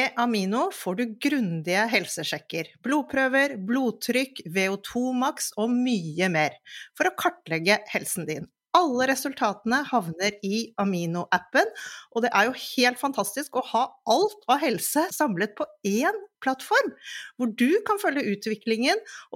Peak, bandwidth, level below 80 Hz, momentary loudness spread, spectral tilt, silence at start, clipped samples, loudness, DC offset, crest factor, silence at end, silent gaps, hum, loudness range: -4 dBFS; 17 kHz; -72 dBFS; 7 LU; -4 dB/octave; 0 s; under 0.1%; -25 LUFS; under 0.1%; 20 dB; 0 s; none; none; 1 LU